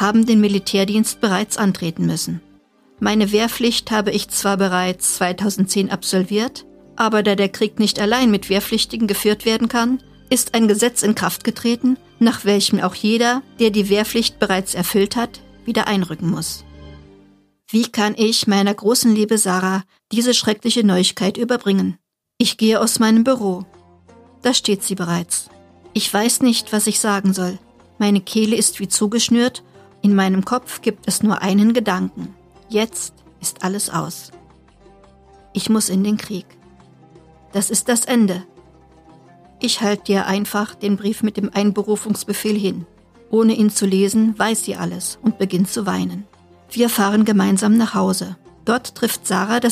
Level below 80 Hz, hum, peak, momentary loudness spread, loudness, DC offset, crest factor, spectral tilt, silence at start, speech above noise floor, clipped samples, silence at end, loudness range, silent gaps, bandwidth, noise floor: -54 dBFS; none; -2 dBFS; 9 LU; -18 LUFS; under 0.1%; 16 dB; -4 dB/octave; 0 s; 35 dB; under 0.1%; 0 s; 5 LU; none; 15.5 kHz; -52 dBFS